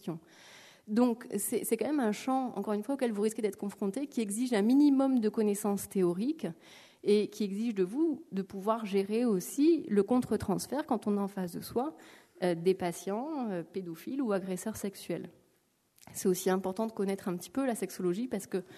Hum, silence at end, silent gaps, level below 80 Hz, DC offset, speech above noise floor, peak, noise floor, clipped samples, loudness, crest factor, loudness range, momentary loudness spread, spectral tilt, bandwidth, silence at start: none; 0 s; none; -70 dBFS; under 0.1%; 41 dB; -14 dBFS; -72 dBFS; under 0.1%; -32 LUFS; 16 dB; 5 LU; 10 LU; -5.5 dB/octave; 13.5 kHz; 0.05 s